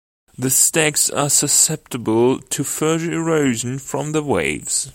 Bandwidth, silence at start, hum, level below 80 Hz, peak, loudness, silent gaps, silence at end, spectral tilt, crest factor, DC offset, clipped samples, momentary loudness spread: 16.5 kHz; 0.4 s; none; -52 dBFS; 0 dBFS; -17 LUFS; none; 0.05 s; -3 dB/octave; 18 dB; under 0.1%; under 0.1%; 10 LU